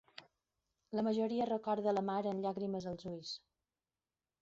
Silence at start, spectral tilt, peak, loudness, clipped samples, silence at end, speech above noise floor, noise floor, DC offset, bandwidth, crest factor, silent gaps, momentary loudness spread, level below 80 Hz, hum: 0.2 s; -5.5 dB/octave; -24 dBFS; -38 LUFS; under 0.1%; 1.05 s; over 53 dB; under -90 dBFS; under 0.1%; 7.8 kHz; 16 dB; none; 12 LU; -76 dBFS; none